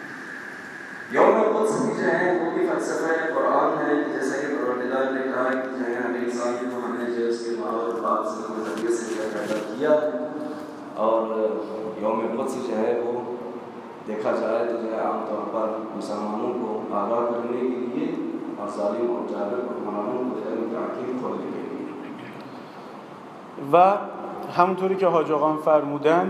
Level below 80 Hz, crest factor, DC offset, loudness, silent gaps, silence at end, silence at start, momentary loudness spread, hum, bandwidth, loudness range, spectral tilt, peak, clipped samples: -80 dBFS; 22 dB; under 0.1%; -25 LUFS; none; 0 s; 0 s; 14 LU; none; 13 kHz; 5 LU; -6 dB/octave; -4 dBFS; under 0.1%